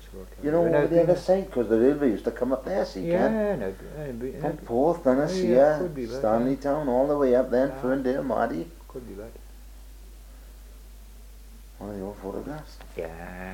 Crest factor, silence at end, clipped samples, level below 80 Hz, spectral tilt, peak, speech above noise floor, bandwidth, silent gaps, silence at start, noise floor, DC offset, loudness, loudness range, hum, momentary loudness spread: 18 dB; 0 s; under 0.1%; -46 dBFS; -7.5 dB/octave; -8 dBFS; 20 dB; 17 kHz; none; 0 s; -45 dBFS; under 0.1%; -25 LUFS; 17 LU; none; 17 LU